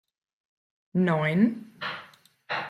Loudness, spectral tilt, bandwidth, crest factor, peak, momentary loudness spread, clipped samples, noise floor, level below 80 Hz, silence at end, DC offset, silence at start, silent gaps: -27 LUFS; -8 dB/octave; 10.5 kHz; 18 dB; -10 dBFS; 12 LU; under 0.1%; -53 dBFS; -72 dBFS; 0 s; under 0.1%; 0.95 s; none